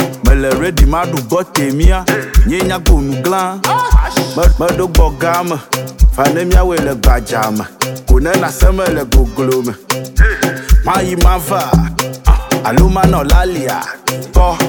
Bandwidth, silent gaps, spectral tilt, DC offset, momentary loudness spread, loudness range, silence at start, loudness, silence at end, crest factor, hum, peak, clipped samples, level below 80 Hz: 19 kHz; none; -5.5 dB/octave; under 0.1%; 6 LU; 1 LU; 0 s; -13 LUFS; 0 s; 10 dB; none; 0 dBFS; under 0.1%; -14 dBFS